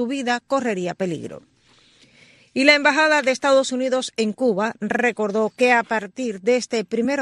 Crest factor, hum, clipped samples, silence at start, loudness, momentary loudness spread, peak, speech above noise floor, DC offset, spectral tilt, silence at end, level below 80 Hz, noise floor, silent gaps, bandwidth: 20 dB; none; under 0.1%; 0 s; -20 LUFS; 10 LU; 0 dBFS; 36 dB; under 0.1%; -3.5 dB/octave; 0 s; -68 dBFS; -56 dBFS; none; 12 kHz